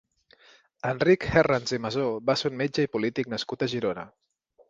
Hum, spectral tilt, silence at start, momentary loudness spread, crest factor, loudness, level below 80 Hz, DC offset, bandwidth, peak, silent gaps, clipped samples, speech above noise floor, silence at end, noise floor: none; -5.5 dB/octave; 0.85 s; 10 LU; 22 dB; -26 LUFS; -54 dBFS; under 0.1%; 7.8 kHz; -4 dBFS; none; under 0.1%; 33 dB; 0.65 s; -58 dBFS